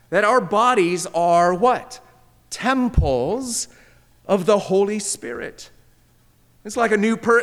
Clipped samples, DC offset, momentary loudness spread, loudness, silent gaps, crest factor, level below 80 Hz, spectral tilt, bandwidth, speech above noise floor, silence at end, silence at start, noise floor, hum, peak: under 0.1%; under 0.1%; 16 LU; -19 LUFS; none; 16 dB; -36 dBFS; -4.5 dB/octave; 15.5 kHz; 37 dB; 0 s; 0.1 s; -56 dBFS; none; -4 dBFS